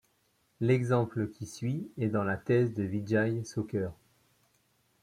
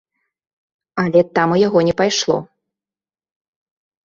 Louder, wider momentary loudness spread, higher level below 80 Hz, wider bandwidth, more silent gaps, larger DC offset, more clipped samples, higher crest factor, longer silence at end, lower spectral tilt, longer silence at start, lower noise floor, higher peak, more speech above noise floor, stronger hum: second, -31 LUFS vs -16 LUFS; about the same, 8 LU vs 8 LU; second, -66 dBFS vs -56 dBFS; first, 13 kHz vs 7.6 kHz; neither; neither; neither; about the same, 18 dB vs 18 dB; second, 1.1 s vs 1.6 s; first, -7.5 dB/octave vs -5 dB/octave; second, 0.6 s vs 0.95 s; second, -72 dBFS vs under -90 dBFS; second, -14 dBFS vs -2 dBFS; second, 42 dB vs over 75 dB; neither